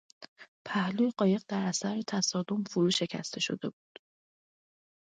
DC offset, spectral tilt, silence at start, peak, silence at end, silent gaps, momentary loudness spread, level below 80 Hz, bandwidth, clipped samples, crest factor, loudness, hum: under 0.1%; -4.5 dB/octave; 0.2 s; -14 dBFS; 1.45 s; 0.28-0.36 s, 0.48-0.65 s; 11 LU; -76 dBFS; 9.4 kHz; under 0.1%; 18 dB; -31 LUFS; none